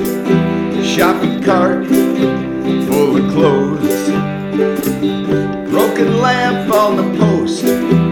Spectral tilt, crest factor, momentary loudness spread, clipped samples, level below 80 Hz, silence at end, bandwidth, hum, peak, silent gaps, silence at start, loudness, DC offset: -6 dB/octave; 12 dB; 4 LU; under 0.1%; -44 dBFS; 0 s; 18 kHz; none; 0 dBFS; none; 0 s; -14 LUFS; under 0.1%